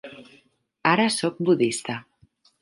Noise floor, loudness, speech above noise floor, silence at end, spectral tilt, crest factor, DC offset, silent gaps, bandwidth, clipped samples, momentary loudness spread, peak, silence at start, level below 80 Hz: -61 dBFS; -23 LUFS; 38 dB; 0.6 s; -4.5 dB/octave; 22 dB; under 0.1%; none; 11.5 kHz; under 0.1%; 14 LU; -4 dBFS; 0.05 s; -70 dBFS